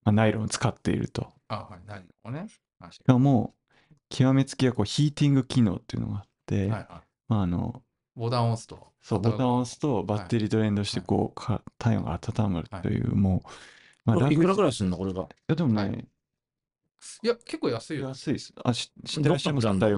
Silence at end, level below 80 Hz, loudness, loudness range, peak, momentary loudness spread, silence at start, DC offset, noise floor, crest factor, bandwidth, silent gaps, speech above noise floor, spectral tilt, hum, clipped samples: 0 s; -52 dBFS; -27 LUFS; 5 LU; -2 dBFS; 15 LU; 0.05 s; under 0.1%; -88 dBFS; 24 dB; 11.5 kHz; none; 62 dB; -6.5 dB/octave; none; under 0.1%